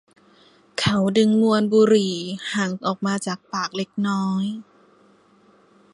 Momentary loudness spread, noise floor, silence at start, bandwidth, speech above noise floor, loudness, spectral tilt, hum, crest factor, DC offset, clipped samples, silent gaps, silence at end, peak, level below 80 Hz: 11 LU; -56 dBFS; 0.75 s; 11.5 kHz; 35 dB; -21 LUFS; -5.5 dB/octave; 50 Hz at -45 dBFS; 16 dB; under 0.1%; under 0.1%; none; 1.3 s; -6 dBFS; -60 dBFS